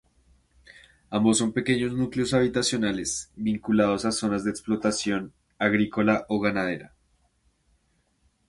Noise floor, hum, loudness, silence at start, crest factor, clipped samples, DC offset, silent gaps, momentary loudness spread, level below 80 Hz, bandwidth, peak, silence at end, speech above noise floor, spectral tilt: -69 dBFS; none; -25 LUFS; 1.1 s; 20 dB; under 0.1%; under 0.1%; none; 7 LU; -56 dBFS; 11.5 kHz; -6 dBFS; 1.6 s; 44 dB; -4.5 dB/octave